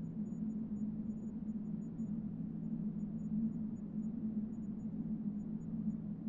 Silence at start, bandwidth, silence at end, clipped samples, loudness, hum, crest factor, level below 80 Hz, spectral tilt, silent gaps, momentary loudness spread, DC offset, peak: 0 s; 7 kHz; 0 s; under 0.1%; -42 LUFS; none; 12 dB; -62 dBFS; -13 dB/octave; none; 3 LU; under 0.1%; -28 dBFS